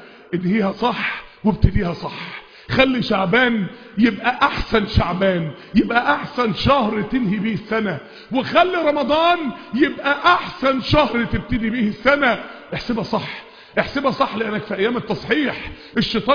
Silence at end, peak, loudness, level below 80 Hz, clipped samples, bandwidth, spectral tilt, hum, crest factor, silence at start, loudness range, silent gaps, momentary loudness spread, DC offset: 0 s; 0 dBFS; -19 LUFS; -36 dBFS; under 0.1%; 5.2 kHz; -7 dB/octave; none; 18 dB; 0 s; 3 LU; none; 9 LU; under 0.1%